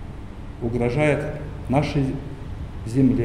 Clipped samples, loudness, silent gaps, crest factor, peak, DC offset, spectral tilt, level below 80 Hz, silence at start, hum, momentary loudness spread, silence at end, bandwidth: under 0.1%; -24 LUFS; none; 16 dB; -6 dBFS; under 0.1%; -8 dB/octave; -36 dBFS; 0 s; none; 15 LU; 0 s; 11 kHz